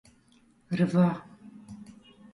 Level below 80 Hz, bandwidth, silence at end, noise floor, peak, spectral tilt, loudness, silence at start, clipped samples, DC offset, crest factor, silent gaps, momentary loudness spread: -66 dBFS; 10.5 kHz; 0.5 s; -62 dBFS; -12 dBFS; -8.5 dB/octave; -27 LUFS; 0.7 s; under 0.1%; under 0.1%; 18 dB; none; 25 LU